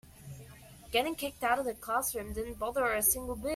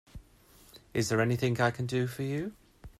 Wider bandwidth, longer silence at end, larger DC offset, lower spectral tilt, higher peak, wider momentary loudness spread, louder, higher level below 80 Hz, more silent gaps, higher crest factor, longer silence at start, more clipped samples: first, 16 kHz vs 14 kHz; about the same, 0 s vs 0.1 s; neither; second, -2.5 dB/octave vs -5.5 dB/octave; about the same, -14 dBFS vs -14 dBFS; first, 21 LU vs 9 LU; about the same, -32 LUFS vs -31 LUFS; first, -52 dBFS vs -58 dBFS; neither; about the same, 20 dB vs 18 dB; about the same, 0.05 s vs 0.15 s; neither